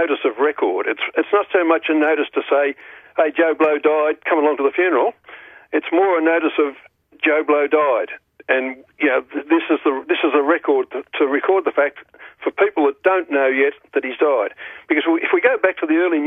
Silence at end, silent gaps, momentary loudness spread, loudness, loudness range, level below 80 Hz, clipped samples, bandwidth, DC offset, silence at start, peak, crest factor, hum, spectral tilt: 0 s; none; 7 LU; -18 LUFS; 1 LU; -70 dBFS; under 0.1%; 3.8 kHz; under 0.1%; 0 s; 0 dBFS; 18 dB; none; -6 dB/octave